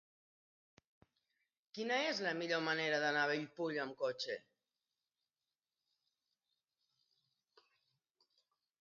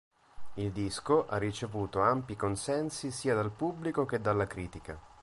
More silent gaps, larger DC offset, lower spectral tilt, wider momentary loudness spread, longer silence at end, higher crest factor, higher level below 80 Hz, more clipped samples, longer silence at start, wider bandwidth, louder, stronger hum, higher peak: neither; neither; second, -1.5 dB/octave vs -5.5 dB/octave; about the same, 9 LU vs 11 LU; first, 4.4 s vs 0 s; about the same, 20 dB vs 20 dB; second, under -90 dBFS vs -54 dBFS; neither; first, 1.75 s vs 0.35 s; second, 7 kHz vs 11.5 kHz; second, -38 LUFS vs -33 LUFS; neither; second, -24 dBFS vs -12 dBFS